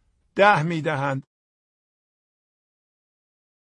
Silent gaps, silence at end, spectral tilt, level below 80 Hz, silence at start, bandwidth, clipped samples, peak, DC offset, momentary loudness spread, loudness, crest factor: none; 2.4 s; -6.5 dB/octave; -66 dBFS; 0.35 s; 10 kHz; under 0.1%; -2 dBFS; under 0.1%; 15 LU; -21 LUFS; 24 dB